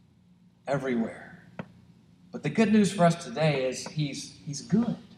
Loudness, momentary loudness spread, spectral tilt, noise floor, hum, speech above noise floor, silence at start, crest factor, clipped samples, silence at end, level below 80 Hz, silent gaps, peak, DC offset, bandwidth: -27 LUFS; 22 LU; -6 dB/octave; -60 dBFS; 60 Hz at -50 dBFS; 33 dB; 0.65 s; 18 dB; under 0.1%; 0.05 s; -66 dBFS; none; -10 dBFS; under 0.1%; 12 kHz